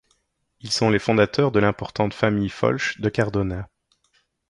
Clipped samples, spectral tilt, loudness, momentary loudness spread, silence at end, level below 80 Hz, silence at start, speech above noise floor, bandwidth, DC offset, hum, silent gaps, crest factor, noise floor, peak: under 0.1%; -5.5 dB/octave; -22 LUFS; 9 LU; 0.85 s; -46 dBFS; 0.65 s; 47 dB; 11.5 kHz; under 0.1%; none; none; 20 dB; -68 dBFS; -2 dBFS